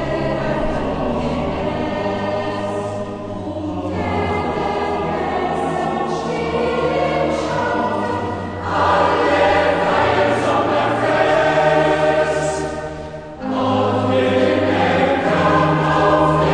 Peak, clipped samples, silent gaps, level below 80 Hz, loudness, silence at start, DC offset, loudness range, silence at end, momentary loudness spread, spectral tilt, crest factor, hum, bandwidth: -2 dBFS; under 0.1%; none; -38 dBFS; -18 LUFS; 0 s; under 0.1%; 6 LU; 0 s; 9 LU; -6 dB/octave; 14 dB; none; 10 kHz